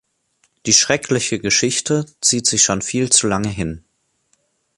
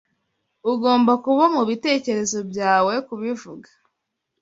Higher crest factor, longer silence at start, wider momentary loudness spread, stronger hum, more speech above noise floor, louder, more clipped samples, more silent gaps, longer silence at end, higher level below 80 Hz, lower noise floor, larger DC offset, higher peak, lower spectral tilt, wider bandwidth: about the same, 20 dB vs 18 dB; about the same, 0.65 s vs 0.65 s; about the same, 12 LU vs 11 LU; neither; second, 47 dB vs 58 dB; first, -16 LUFS vs -20 LUFS; neither; neither; first, 1 s vs 0.8 s; first, -46 dBFS vs -66 dBFS; second, -65 dBFS vs -78 dBFS; neither; first, 0 dBFS vs -4 dBFS; second, -2.5 dB/octave vs -4 dB/octave; first, 11.5 kHz vs 8 kHz